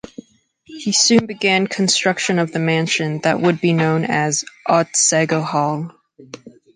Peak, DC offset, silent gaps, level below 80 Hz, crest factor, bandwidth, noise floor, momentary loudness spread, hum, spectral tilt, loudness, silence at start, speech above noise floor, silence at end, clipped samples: -2 dBFS; under 0.1%; none; -62 dBFS; 16 dB; 10 kHz; -52 dBFS; 6 LU; none; -3.5 dB/octave; -17 LUFS; 0.7 s; 35 dB; 0.25 s; under 0.1%